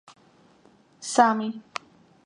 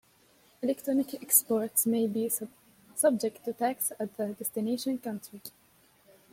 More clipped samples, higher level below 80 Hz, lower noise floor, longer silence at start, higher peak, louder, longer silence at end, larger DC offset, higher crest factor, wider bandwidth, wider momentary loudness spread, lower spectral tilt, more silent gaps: neither; about the same, -76 dBFS vs -76 dBFS; second, -58 dBFS vs -63 dBFS; first, 1 s vs 0.6 s; first, -2 dBFS vs -8 dBFS; first, -23 LUFS vs -29 LUFS; second, 0.65 s vs 0.85 s; neither; about the same, 26 dB vs 24 dB; second, 11 kHz vs 16.5 kHz; about the same, 18 LU vs 16 LU; about the same, -3.5 dB/octave vs -3.5 dB/octave; neither